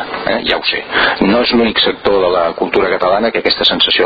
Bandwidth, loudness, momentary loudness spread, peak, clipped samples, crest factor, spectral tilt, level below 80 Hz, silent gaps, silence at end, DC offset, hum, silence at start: 7.4 kHz; -12 LUFS; 4 LU; 0 dBFS; under 0.1%; 12 dB; -6 dB/octave; -40 dBFS; none; 0 s; under 0.1%; none; 0 s